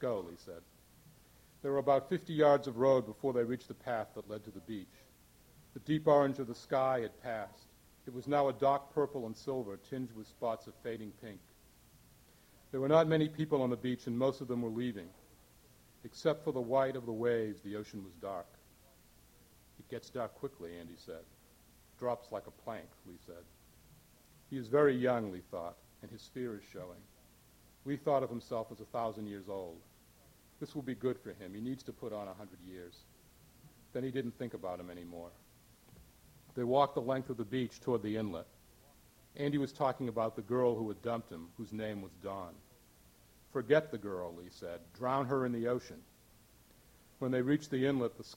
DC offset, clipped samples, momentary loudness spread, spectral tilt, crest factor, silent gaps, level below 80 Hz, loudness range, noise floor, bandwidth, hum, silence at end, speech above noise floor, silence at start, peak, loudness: under 0.1%; under 0.1%; 20 LU; -7 dB/octave; 24 dB; none; -70 dBFS; 11 LU; -64 dBFS; 17 kHz; none; 0 s; 28 dB; 0 s; -14 dBFS; -36 LUFS